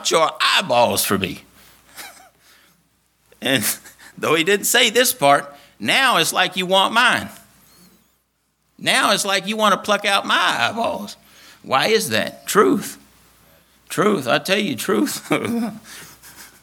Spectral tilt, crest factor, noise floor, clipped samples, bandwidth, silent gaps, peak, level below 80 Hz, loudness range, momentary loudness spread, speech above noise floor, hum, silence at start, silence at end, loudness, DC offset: -2.5 dB/octave; 20 dB; -67 dBFS; under 0.1%; 19 kHz; none; 0 dBFS; -64 dBFS; 5 LU; 15 LU; 49 dB; none; 0 s; 0.15 s; -18 LUFS; under 0.1%